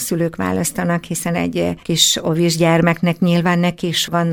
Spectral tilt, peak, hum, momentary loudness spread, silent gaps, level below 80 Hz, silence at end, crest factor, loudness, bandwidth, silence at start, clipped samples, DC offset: -4.5 dB/octave; 0 dBFS; none; 7 LU; none; -46 dBFS; 0 s; 16 dB; -17 LUFS; 18.5 kHz; 0 s; under 0.1%; under 0.1%